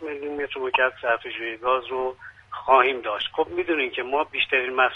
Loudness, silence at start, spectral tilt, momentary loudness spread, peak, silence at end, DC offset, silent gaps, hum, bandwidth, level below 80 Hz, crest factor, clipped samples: -24 LUFS; 0 s; -5 dB/octave; 12 LU; -4 dBFS; 0 s; under 0.1%; none; none; 6.4 kHz; -60 dBFS; 20 dB; under 0.1%